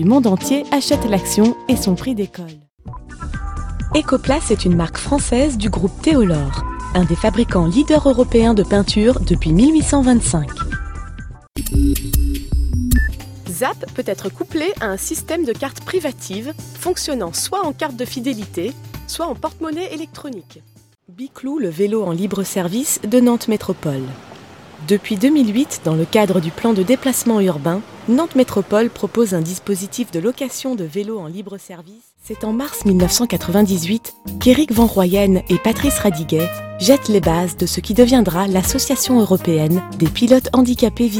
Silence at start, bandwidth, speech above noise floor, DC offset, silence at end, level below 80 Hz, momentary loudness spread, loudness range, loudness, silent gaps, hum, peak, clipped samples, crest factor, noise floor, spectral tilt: 0 s; 17 kHz; 22 dB; under 0.1%; 0 s; -28 dBFS; 14 LU; 8 LU; -17 LUFS; 2.74-2.78 s; none; 0 dBFS; under 0.1%; 16 dB; -39 dBFS; -5.5 dB/octave